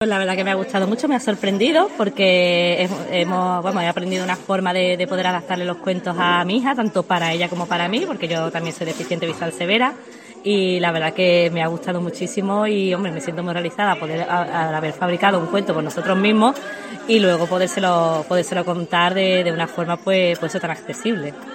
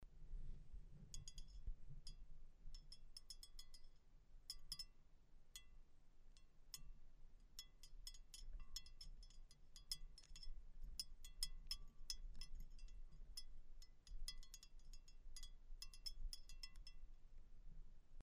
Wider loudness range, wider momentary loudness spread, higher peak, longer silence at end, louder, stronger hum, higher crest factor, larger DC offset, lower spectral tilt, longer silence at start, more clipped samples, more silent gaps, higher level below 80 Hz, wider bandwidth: second, 3 LU vs 7 LU; second, 8 LU vs 14 LU; first, -2 dBFS vs -28 dBFS; about the same, 0 s vs 0 s; first, -19 LUFS vs -58 LUFS; neither; second, 18 dB vs 26 dB; neither; first, -5 dB/octave vs -1.5 dB/octave; about the same, 0 s vs 0 s; neither; neither; second, -68 dBFS vs -56 dBFS; about the same, 16 kHz vs 15.5 kHz